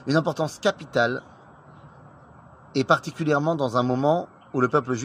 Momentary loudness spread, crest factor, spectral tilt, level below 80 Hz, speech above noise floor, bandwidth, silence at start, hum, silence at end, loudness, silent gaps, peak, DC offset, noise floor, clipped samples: 6 LU; 20 dB; -6 dB/octave; -62 dBFS; 26 dB; 15.5 kHz; 0 s; none; 0 s; -24 LUFS; none; -4 dBFS; under 0.1%; -49 dBFS; under 0.1%